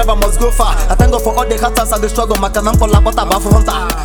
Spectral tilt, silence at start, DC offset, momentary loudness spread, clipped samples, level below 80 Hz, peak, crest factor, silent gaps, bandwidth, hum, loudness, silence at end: -5 dB/octave; 0 s; under 0.1%; 4 LU; under 0.1%; -14 dBFS; 0 dBFS; 10 dB; none; over 20 kHz; none; -13 LUFS; 0 s